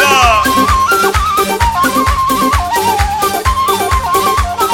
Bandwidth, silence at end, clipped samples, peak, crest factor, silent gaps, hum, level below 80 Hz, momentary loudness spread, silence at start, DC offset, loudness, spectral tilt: 17 kHz; 0 s; under 0.1%; 0 dBFS; 12 dB; none; none; -22 dBFS; 4 LU; 0 s; under 0.1%; -11 LUFS; -3.5 dB/octave